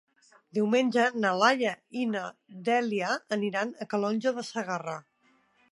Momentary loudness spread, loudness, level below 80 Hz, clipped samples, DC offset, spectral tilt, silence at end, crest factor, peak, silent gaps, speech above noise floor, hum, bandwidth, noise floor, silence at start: 11 LU; -28 LUFS; -82 dBFS; under 0.1%; under 0.1%; -4.5 dB/octave; 0.7 s; 22 dB; -8 dBFS; none; 39 dB; none; 11.5 kHz; -67 dBFS; 0.55 s